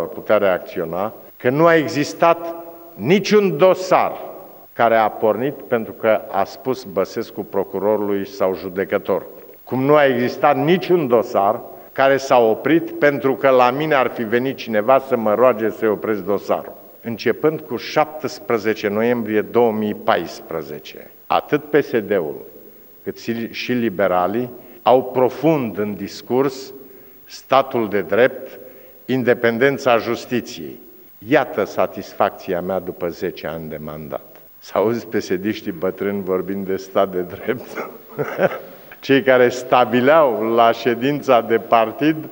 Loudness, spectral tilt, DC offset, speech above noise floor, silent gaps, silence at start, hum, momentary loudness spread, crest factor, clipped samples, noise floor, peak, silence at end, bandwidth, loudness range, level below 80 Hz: -18 LUFS; -6 dB/octave; under 0.1%; 25 dB; none; 0 s; none; 16 LU; 18 dB; under 0.1%; -43 dBFS; 0 dBFS; 0 s; 16.5 kHz; 6 LU; -62 dBFS